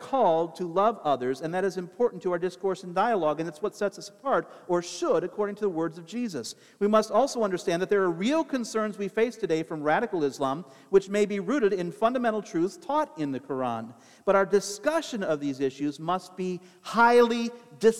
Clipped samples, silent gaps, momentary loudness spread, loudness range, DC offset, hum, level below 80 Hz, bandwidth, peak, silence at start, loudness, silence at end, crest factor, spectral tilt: under 0.1%; none; 9 LU; 2 LU; under 0.1%; none; -68 dBFS; 14 kHz; -8 dBFS; 0 s; -27 LUFS; 0 s; 18 dB; -5 dB/octave